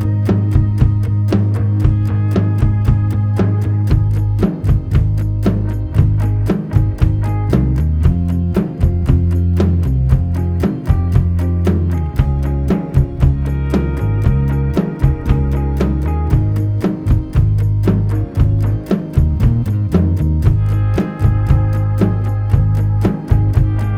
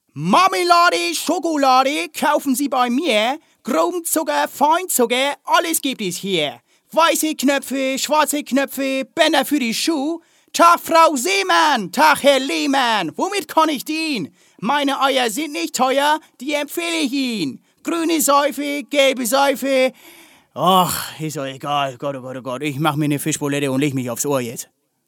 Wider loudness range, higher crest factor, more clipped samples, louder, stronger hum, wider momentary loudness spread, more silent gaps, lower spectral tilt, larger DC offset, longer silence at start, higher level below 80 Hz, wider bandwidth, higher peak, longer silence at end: second, 1 LU vs 5 LU; about the same, 14 dB vs 18 dB; neither; about the same, -16 LUFS vs -18 LUFS; neither; second, 3 LU vs 11 LU; neither; first, -9.5 dB/octave vs -3 dB/octave; neither; second, 0 s vs 0.15 s; first, -20 dBFS vs -68 dBFS; second, 6.6 kHz vs 17.5 kHz; about the same, 0 dBFS vs 0 dBFS; second, 0 s vs 0.45 s